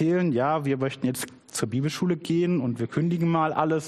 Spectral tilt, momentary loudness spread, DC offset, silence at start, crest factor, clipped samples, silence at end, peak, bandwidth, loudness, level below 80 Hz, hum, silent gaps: -6.5 dB/octave; 6 LU; under 0.1%; 0 s; 16 dB; under 0.1%; 0 s; -10 dBFS; 14.5 kHz; -26 LUFS; -64 dBFS; none; none